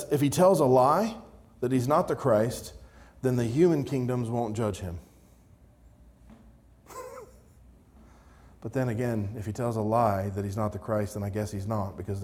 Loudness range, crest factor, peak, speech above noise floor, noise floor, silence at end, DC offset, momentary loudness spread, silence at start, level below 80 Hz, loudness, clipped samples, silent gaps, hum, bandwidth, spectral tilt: 13 LU; 18 dB; -10 dBFS; 30 dB; -57 dBFS; 0 s; under 0.1%; 21 LU; 0 s; -56 dBFS; -27 LUFS; under 0.1%; none; none; 18.5 kHz; -7 dB/octave